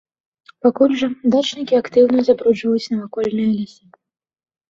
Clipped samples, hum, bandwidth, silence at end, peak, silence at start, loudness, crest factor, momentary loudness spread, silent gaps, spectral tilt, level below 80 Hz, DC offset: under 0.1%; none; 7.6 kHz; 1.05 s; -2 dBFS; 0.65 s; -17 LUFS; 16 dB; 8 LU; none; -6 dB/octave; -60 dBFS; under 0.1%